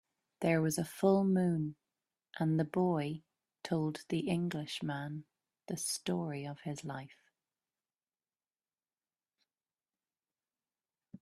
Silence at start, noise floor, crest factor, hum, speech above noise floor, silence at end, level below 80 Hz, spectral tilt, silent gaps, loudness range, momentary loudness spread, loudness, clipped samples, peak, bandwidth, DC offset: 0.4 s; under -90 dBFS; 20 dB; none; over 56 dB; 4.1 s; -74 dBFS; -6 dB/octave; none; 14 LU; 14 LU; -35 LUFS; under 0.1%; -16 dBFS; 14 kHz; under 0.1%